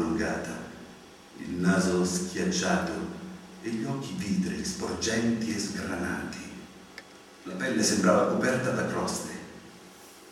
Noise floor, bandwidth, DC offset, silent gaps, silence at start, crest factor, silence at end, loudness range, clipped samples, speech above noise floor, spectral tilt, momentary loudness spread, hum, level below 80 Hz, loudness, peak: -50 dBFS; 15 kHz; under 0.1%; none; 0 s; 20 dB; 0 s; 3 LU; under 0.1%; 22 dB; -4.5 dB/octave; 22 LU; none; -60 dBFS; -29 LUFS; -10 dBFS